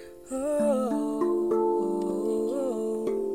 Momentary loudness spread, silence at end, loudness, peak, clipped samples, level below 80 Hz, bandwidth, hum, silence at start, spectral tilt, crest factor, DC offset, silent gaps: 4 LU; 0 s; -27 LUFS; -14 dBFS; under 0.1%; -62 dBFS; 15.5 kHz; none; 0 s; -6.5 dB/octave; 12 dB; 0.2%; none